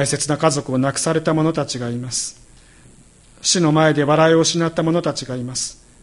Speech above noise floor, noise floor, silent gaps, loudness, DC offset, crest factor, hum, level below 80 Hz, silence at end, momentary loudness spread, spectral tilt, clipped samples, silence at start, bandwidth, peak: 30 dB; -48 dBFS; none; -18 LUFS; under 0.1%; 18 dB; none; -52 dBFS; 0.3 s; 11 LU; -4.5 dB/octave; under 0.1%; 0 s; 11.5 kHz; -2 dBFS